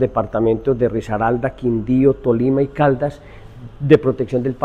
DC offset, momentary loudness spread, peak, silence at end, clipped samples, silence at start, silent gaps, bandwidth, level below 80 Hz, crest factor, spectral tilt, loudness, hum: under 0.1%; 7 LU; 0 dBFS; 0 s; under 0.1%; 0 s; none; 8.4 kHz; -40 dBFS; 16 dB; -9 dB/octave; -18 LUFS; none